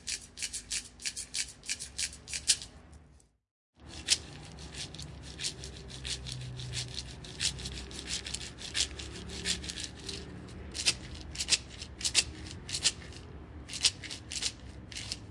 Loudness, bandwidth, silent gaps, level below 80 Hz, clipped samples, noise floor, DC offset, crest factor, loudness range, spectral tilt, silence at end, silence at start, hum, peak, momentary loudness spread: -34 LUFS; 11.5 kHz; 3.51-3.73 s; -52 dBFS; under 0.1%; -61 dBFS; under 0.1%; 30 dB; 6 LU; -1 dB/octave; 0 s; 0 s; none; -8 dBFS; 16 LU